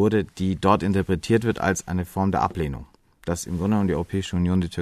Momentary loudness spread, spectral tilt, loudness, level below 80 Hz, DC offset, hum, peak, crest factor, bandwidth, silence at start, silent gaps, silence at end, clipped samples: 9 LU; -6.5 dB/octave; -24 LUFS; -42 dBFS; under 0.1%; none; -4 dBFS; 20 dB; 14 kHz; 0 s; none; 0 s; under 0.1%